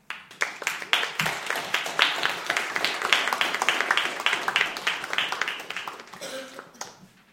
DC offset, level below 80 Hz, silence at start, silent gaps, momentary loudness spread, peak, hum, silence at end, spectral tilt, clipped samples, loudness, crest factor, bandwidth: under 0.1%; -70 dBFS; 0.1 s; none; 16 LU; 0 dBFS; none; 0.25 s; -0.5 dB/octave; under 0.1%; -25 LUFS; 28 dB; 16.5 kHz